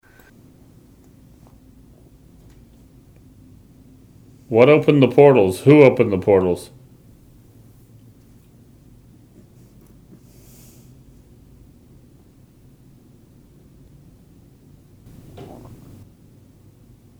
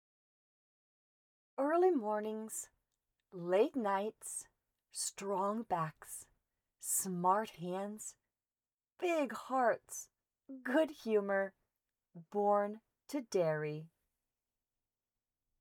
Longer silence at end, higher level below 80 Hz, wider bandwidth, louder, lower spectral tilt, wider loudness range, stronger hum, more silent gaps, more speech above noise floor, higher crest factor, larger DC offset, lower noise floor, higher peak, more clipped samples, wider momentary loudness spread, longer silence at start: about the same, 1.75 s vs 1.75 s; first, -54 dBFS vs -84 dBFS; second, 15 kHz vs 19.5 kHz; first, -14 LUFS vs -36 LUFS; first, -7.5 dB/octave vs -4.5 dB/octave; first, 10 LU vs 3 LU; neither; neither; second, 36 dB vs over 54 dB; about the same, 22 dB vs 20 dB; neither; second, -50 dBFS vs under -90 dBFS; first, 0 dBFS vs -18 dBFS; neither; first, 29 LU vs 16 LU; first, 4.5 s vs 1.6 s